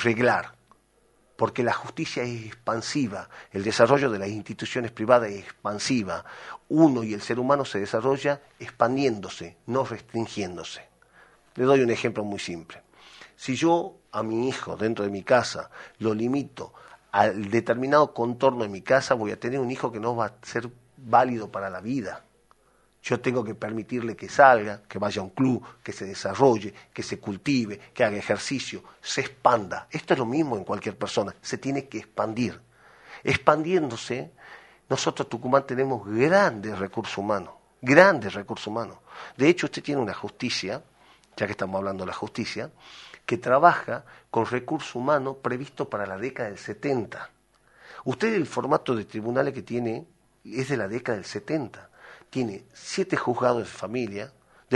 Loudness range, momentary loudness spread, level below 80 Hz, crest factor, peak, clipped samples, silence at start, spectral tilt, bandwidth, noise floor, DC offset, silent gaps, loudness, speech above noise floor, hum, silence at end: 6 LU; 15 LU; -64 dBFS; 26 dB; 0 dBFS; under 0.1%; 0 s; -5.5 dB/octave; 11.5 kHz; -64 dBFS; under 0.1%; none; -26 LUFS; 38 dB; none; 0 s